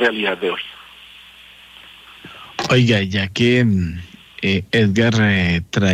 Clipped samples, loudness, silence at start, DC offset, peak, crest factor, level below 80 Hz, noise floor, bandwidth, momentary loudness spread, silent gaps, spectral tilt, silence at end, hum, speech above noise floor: under 0.1%; -17 LUFS; 0 s; under 0.1%; -4 dBFS; 14 dB; -44 dBFS; -43 dBFS; 13 kHz; 21 LU; none; -6 dB/octave; 0 s; none; 27 dB